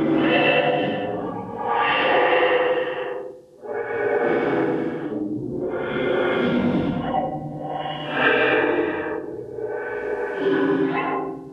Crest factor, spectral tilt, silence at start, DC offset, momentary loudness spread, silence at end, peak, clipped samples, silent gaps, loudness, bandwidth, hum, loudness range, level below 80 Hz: 18 dB; -7.5 dB/octave; 0 s; under 0.1%; 12 LU; 0 s; -6 dBFS; under 0.1%; none; -22 LUFS; 6.6 kHz; none; 3 LU; -54 dBFS